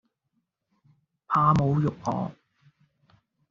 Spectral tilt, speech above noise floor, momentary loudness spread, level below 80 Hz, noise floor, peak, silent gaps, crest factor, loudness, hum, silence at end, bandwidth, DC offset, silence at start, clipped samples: -8 dB/octave; 54 dB; 11 LU; -56 dBFS; -78 dBFS; -8 dBFS; none; 22 dB; -25 LUFS; none; 1.2 s; 7.2 kHz; under 0.1%; 1.3 s; under 0.1%